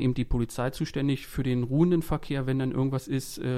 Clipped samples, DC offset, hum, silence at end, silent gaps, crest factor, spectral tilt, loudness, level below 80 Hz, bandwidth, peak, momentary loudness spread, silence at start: under 0.1%; under 0.1%; none; 0 s; none; 16 dB; -7 dB/octave; -28 LUFS; -40 dBFS; 15.5 kHz; -10 dBFS; 6 LU; 0 s